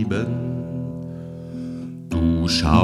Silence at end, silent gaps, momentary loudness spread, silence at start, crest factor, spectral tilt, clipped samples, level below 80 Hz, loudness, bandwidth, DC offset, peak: 0 s; none; 14 LU; 0 s; 20 dB; -6 dB/octave; under 0.1%; -34 dBFS; -24 LUFS; 13.5 kHz; under 0.1%; -2 dBFS